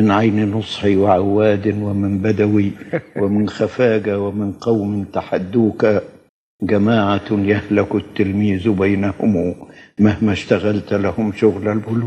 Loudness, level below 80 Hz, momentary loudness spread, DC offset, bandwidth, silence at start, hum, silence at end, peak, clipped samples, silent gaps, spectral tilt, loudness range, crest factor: -17 LUFS; -54 dBFS; 7 LU; under 0.1%; 8.6 kHz; 0 s; none; 0 s; 0 dBFS; under 0.1%; 6.29-6.59 s; -8 dB/octave; 2 LU; 16 dB